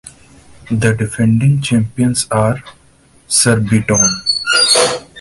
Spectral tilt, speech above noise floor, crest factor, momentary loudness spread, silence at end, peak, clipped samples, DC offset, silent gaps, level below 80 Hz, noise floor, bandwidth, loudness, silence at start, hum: -3.5 dB/octave; 35 dB; 14 dB; 6 LU; 0 s; 0 dBFS; under 0.1%; under 0.1%; none; -42 dBFS; -48 dBFS; 11.5 kHz; -13 LUFS; 0.05 s; none